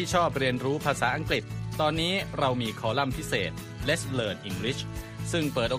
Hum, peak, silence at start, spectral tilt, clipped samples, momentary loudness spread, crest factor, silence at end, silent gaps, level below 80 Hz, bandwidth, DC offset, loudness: none; -10 dBFS; 0 s; -4.5 dB/octave; under 0.1%; 7 LU; 18 dB; 0 s; none; -46 dBFS; 15.5 kHz; under 0.1%; -28 LUFS